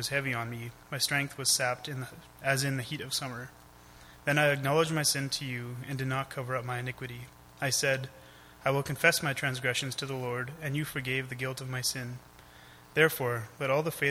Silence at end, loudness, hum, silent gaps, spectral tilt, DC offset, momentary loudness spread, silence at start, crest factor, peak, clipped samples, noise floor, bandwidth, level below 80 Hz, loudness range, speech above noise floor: 0 s; -30 LUFS; none; none; -3.5 dB/octave; under 0.1%; 14 LU; 0 s; 24 dB; -8 dBFS; under 0.1%; -54 dBFS; 16.5 kHz; -62 dBFS; 3 LU; 22 dB